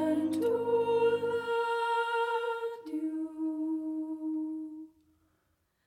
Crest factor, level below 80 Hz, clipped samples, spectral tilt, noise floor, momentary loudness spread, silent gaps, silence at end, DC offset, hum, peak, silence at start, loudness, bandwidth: 14 dB; -76 dBFS; under 0.1%; -5.5 dB/octave; -76 dBFS; 9 LU; none; 1 s; under 0.1%; none; -18 dBFS; 0 s; -32 LUFS; 14.5 kHz